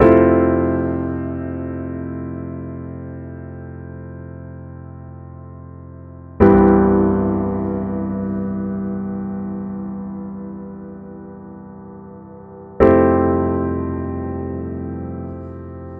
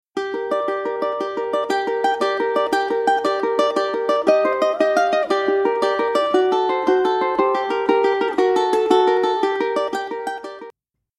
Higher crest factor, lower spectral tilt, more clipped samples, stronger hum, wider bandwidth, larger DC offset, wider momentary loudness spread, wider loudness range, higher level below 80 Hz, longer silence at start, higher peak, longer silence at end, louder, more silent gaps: about the same, 20 dB vs 18 dB; first, -11.5 dB/octave vs -3.5 dB/octave; neither; neither; second, 3.7 kHz vs 13 kHz; neither; first, 24 LU vs 7 LU; first, 15 LU vs 2 LU; first, -36 dBFS vs -62 dBFS; second, 0 s vs 0.15 s; about the same, 0 dBFS vs 0 dBFS; second, 0 s vs 0.5 s; about the same, -19 LUFS vs -19 LUFS; neither